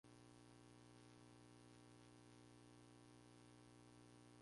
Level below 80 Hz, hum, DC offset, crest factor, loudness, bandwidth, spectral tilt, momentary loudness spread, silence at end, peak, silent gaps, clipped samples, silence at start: -82 dBFS; 60 Hz at -70 dBFS; under 0.1%; 14 dB; -67 LUFS; 11.5 kHz; -5 dB/octave; 0 LU; 0 s; -54 dBFS; none; under 0.1%; 0.05 s